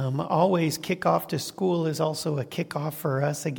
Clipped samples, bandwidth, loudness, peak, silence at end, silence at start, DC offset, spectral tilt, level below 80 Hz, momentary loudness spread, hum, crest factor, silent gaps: under 0.1%; 17.5 kHz; -26 LUFS; -8 dBFS; 0 s; 0 s; under 0.1%; -6 dB/octave; -66 dBFS; 7 LU; none; 18 dB; none